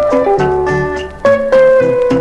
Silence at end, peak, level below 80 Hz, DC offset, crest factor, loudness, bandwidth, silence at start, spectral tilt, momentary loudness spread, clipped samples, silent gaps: 0 s; 0 dBFS; -34 dBFS; under 0.1%; 10 dB; -11 LUFS; 9.2 kHz; 0 s; -7 dB/octave; 7 LU; under 0.1%; none